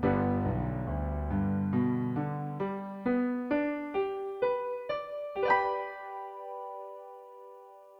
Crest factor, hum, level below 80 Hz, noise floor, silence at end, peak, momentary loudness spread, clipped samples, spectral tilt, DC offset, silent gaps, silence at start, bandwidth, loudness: 18 dB; none; -46 dBFS; -52 dBFS; 0 s; -14 dBFS; 16 LU; under 0.1%; -9.5 dB/octave; under 0.1%; none; 0 s; 5.8 kHz; -32 LUFS